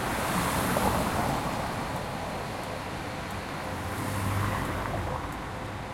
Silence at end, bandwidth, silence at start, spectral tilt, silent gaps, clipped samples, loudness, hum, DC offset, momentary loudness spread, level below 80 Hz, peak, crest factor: 0 s; 16.5 kHz; 0 s; -5 dB/octave; none; under 0.1%; -31 LUFS; none; under 0.1%; 8 LU; -44 dBFS; -12 dBFS; 20 dB